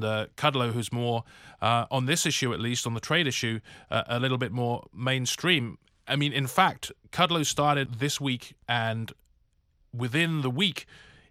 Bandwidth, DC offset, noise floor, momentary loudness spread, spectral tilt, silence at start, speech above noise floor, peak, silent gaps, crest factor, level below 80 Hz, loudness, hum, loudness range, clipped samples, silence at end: 16 kHz; under 0.1%; -67 dBFS; 10 LU; -4 dB/octave; 0 s; 40 dB; -6 dBFS; none; 22 dB; -62 dBFS; -27 LUFS; none; 3 LU; under 0.1%; 0.3 s